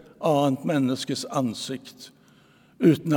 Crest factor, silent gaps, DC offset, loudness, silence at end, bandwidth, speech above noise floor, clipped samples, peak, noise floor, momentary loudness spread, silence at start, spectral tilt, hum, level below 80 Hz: 20 dB; none; under 0.1%; -25 LUFS; 0 s; 18 kHz; 33 dB; under 0.1%; -6 dBFS; -57 dBFS; 15 LU; 0.2 s; -6 dB/octave; none; -72 dBFS